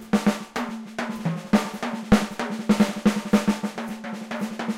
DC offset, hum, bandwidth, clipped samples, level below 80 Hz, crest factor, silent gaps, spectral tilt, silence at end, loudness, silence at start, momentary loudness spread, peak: under 0.1%; none; 15.5 kHz; under 0.1%; -46 dBFS; 22 dB; none; -5.5 dB/octave; 0 s; -25 LUFS; 0 s; 10 LU; -2 dBFS